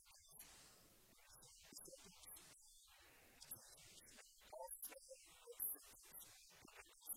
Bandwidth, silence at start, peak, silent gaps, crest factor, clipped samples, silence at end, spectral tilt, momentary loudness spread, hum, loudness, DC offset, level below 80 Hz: 16.5 kHz; 0 s; -34 dBFS; none; 26 dB; under 0.1%; 0 s; -1 dB/octave; 17 LU; none; -56 LUFS; under 0.1%; -80 dBFS